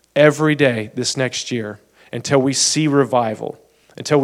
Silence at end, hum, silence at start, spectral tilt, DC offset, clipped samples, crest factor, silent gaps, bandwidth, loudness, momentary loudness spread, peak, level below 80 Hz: 0 s; none; 0.15 s; -4 dB/octave; under 0.1%; under 0.1%; 18 dB; none; 15 kHz; -17 LUFS; 16 LU; 0 dBFS; -62 dBFS